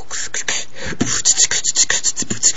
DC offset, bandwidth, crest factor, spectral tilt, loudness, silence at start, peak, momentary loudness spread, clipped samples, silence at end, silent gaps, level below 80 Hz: 7%; 11 kHz; 20 dB; 0 dB/octave; -16 LUFS; 0 s; 0 dBFS; 11 LU; under 0.1%; 0 s; none; -46 dBFS